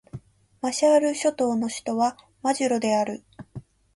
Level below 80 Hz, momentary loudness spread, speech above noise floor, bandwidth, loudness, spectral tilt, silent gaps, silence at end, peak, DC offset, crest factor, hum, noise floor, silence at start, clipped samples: -62 dBFS; 23 LU; 21 dB; 11.5 kHz; -24 LUFS; -4 dB/octave; none; 0.35 s; -8 dBFS; under 0.1%; 16 dB; none; -44 dBFS; 0.15 s; under 0.1%